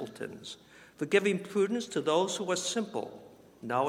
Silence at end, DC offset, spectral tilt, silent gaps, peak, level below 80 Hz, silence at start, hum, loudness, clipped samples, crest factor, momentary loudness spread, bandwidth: 0 s; under 0.1%; -4 dB/octave; none; -12 dBFS; -76 dBFS; 0 s; none; -31 LUFS; under 0.1%; 20 dB; 18 LU; 15.5 kHz